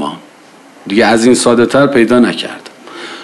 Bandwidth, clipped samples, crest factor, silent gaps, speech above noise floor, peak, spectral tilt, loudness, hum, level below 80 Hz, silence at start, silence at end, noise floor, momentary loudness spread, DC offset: 12.5 kHz; under 0.1%; 12 dB; none; 30 dB; 0 dBFS; -4.5 dB/octave; -10 LUFS; none; -48 dBFS; 0 s; 0 s; -40 dBFS; 21 LU; under 0.1%